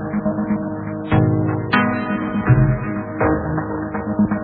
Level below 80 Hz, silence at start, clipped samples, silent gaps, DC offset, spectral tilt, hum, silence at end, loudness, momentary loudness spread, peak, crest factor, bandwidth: -36 dBFS; 0 s; under 0.1%; none; under 0.1%; -11.5 dB/octave; none; 0 s; -20 LUFS; 9 LU; -2 dBFS; 16 dB; 4.8 kHz